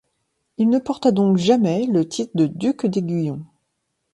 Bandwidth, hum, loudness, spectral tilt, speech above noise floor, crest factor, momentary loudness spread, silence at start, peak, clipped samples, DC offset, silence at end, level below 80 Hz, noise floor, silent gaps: 11.5 kHz; none; -20 LUFS; -7 dB/octave; 55 dB; 16 dB; 8 LU; 0.6 s; -4 dBFS; under 0.1%; under 0.1%; 0.7 s; -62 dBFS; -74 dBFS; none